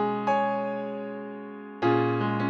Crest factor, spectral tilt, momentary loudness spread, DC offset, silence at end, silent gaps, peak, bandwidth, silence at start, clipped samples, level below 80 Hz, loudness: 16 dB; -8 dB/octave; 14 LU; under 0.1%; 0 s; none; -12 dBFS; 7.4 kHz; 0 s; under 0.1%; -74 dBFS; -27 LUFS